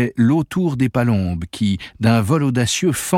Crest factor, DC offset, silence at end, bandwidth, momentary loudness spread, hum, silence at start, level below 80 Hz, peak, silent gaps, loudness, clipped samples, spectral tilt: 16 dB; under 0.1%; 0 s; 16.5 kHz; 5 LU; none; 0 s; -44 dBFS; -2 dBFS; none; -18 LUFS; under 0.1%; -5.5 dB/octave